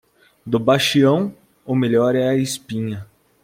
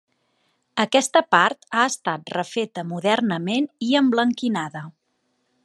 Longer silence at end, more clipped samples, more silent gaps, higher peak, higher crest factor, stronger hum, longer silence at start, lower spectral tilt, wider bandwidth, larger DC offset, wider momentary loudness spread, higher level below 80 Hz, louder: second, 0.4 s vs 0.75 s; neither; neither; about the same, -2 dBFS vs -2 dBFS; second, 16 dB vs 22 dB; neither; second, 0.45 s vs 0.75 s; first, -5.5 dB/octave vs -4 dB/octave; first, 16.5 kHz vs 12.5 kHz; neither; about the same, 12 LU vs 10 LU; first, -58 dBFS vs -76 dBFS; about the same, -19 LUFS vs -21 LUFS